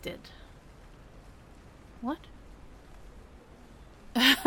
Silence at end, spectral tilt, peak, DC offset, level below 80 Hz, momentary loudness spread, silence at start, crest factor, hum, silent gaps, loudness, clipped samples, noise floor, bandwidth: 0 s; -2 dB/octave; -8 dBFS; under 0.1%; -54 dBFS; 19 LU; 0.05 s; 26 dB; none; none; -29 LUFS; under 0.1%; -52 dBFS; 17.5 kHz